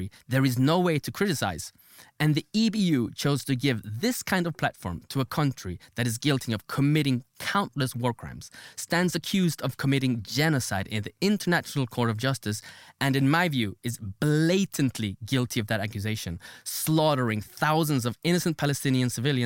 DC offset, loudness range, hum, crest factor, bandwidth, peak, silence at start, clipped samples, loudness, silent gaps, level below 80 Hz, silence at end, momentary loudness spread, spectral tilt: under 0.1%; 2 LU; none; 16 dB; 17 kHz; -10 dBFS; 0 s; under 0.1%; -27 LUFS; none; -58 dBFS; 0 s; 10 LU; -5 dB/octave